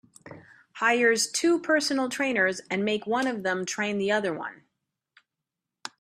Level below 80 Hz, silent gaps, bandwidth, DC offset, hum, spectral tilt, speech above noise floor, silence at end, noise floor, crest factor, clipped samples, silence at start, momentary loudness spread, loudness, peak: -74 dBFS; none; 14.5 kHz; under 0.1%; none; -3 dB/octave; 61 dB; 0.15 s; -87 dBFS; 18 dB; under 0.1%; 0.25 s; 10 LU; -25 LUFS; -10 dBFS